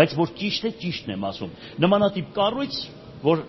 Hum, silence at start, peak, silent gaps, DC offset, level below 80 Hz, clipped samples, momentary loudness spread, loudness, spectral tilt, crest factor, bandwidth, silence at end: none; 0 s; -2 dBFS; none; under 0.1%; -56 dBFS; under 0.1%; 11 LU; -24 LUFS; -4.5 dB/octave; 20 dB; 6.2 kHz; 0 s